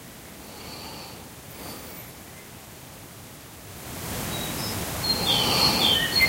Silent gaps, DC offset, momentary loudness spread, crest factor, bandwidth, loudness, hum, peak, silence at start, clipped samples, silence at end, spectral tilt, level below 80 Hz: none; under 0.1%; 23 LU; 20 dB; 16 kHz; -23 LUFS; none; -8 dBFS; 0 s; under 0.1%; 0 s; -2.5 dB/octave; -48 dBFS